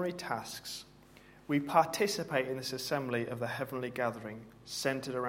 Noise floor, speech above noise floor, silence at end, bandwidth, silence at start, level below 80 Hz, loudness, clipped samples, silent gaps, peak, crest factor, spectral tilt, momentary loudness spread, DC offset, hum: -58 dBFS; 23 dB; 0 s; 16.5 kHz; 0 s; -68 dBFS; -34 LUFS; under 0.1%; none; -12 dBFS; 24 dB; -4 dB/octave; 15 LU; under 0.1%; none